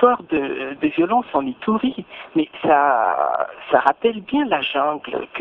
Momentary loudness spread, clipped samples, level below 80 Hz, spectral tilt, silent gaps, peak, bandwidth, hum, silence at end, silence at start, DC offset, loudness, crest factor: 8 LU; under 0.1%; -58 dBFS; -7.5 dB/octave; none; 0 dBFS; 4.3 kHz; none; 0 s; 0 s; under 0.1%; -20 LUFS; 20 dB